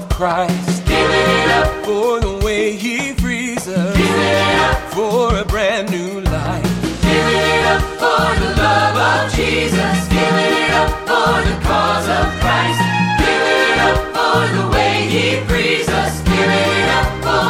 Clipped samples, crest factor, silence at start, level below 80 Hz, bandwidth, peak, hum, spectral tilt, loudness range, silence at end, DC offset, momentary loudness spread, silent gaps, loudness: under 0.1%; 14 dB; 0 s; -26 dBFS; 16.5 kHz; -2 dBFS; none; -4.5 dB/octave; 2 LU; 0 s; under 0.1%; 6 LU; none; -15 LUFS